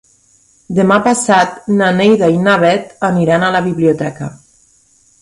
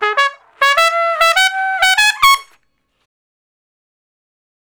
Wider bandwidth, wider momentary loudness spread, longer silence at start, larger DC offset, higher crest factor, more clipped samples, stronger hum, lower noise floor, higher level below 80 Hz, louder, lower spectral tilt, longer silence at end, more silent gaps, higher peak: second, 11.5 kHz vs over 20 kHz; about the same, 8 LU vs 6 LU; first, 0.7 s vs 0 s; neither; about the same, 14 dB vs 16 dB; second, under 0.1% vs 0.7%; neither; second, -51 dBFS vs -63 dBFS; about the same, -52 dBFS vs -52 dBFS; about the same, -12 LUFS vs -12 LUFS; first, -5.5 dB/octave vs 2.5 dB/octave; second, 0.85 s vs 2.35 s; neither; about the same, 0 dBFS vs 0 dBFS